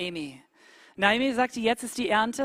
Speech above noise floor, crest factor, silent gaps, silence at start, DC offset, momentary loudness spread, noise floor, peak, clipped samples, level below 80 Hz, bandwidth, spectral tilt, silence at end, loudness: 29 dB; 22 dB; none; 0 s; under 0.1%; 12 LU; -56 dBFS; -6 dBFS; under 0.1%; -62 dBFS; 16 kHz; -3.5 dB/octave; 0 s; -26 LUFS